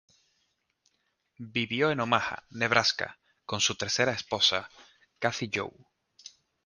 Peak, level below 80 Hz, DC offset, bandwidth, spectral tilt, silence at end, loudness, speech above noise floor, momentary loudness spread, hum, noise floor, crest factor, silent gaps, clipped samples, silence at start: -4 dBFS; -64 dBFS; under 0.1%; 10.5 kHz; -2.5 dB/octave; 0.35 s; -28 LUFS; 47 dB; 13 LU; none; -76 dBFS; 28 dB; none; under 0.1%; 1.4 s